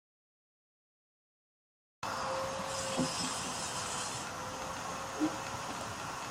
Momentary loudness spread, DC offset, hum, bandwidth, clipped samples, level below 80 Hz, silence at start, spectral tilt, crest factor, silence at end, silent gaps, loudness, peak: 6 LU; under 0.1%; none; 16 kHz; under 0.1%; -64 dBFS; 2 s; -3 dB/octave; 20 dB; 0 s; none; -37 LUFS; -20 dBFS